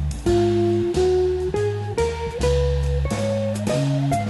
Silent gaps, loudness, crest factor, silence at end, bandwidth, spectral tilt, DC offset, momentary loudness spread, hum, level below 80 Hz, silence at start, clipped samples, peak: none; -22 LUFS; 12 dB; 0 s; 12 kHz; -7 dB/octave; under 0.1%; 5 LU; none; -30 dBFS; 0 s; under 0.1%; -8 dBFS